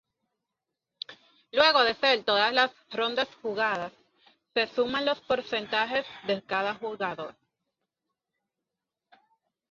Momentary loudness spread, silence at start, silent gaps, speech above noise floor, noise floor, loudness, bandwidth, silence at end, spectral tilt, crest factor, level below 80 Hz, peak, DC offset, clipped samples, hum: 17 LU; 1.1 s; none; 60 dB; -87 dBFS; -27 LUFS; 7.4 kHz; 2.4 s; -3.5 dB/octave; 24 dB; -70 dBFS; -6 dBFS; under 0.1%; under 0.1%; none